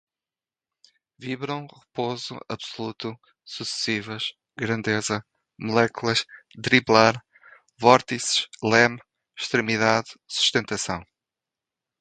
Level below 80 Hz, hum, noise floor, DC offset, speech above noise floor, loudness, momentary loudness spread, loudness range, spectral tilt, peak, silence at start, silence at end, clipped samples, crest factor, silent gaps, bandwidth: -60 dBFS; none; under -90 dBFS; under 0.1%; over 66 dB; -23 LUFS; 16 LU; 10 LU; -3.5 dB/octave; 0 dBFS; 1.2 s; 0.95 s; under 0.1%; 26 dB; none; 9.4 kHz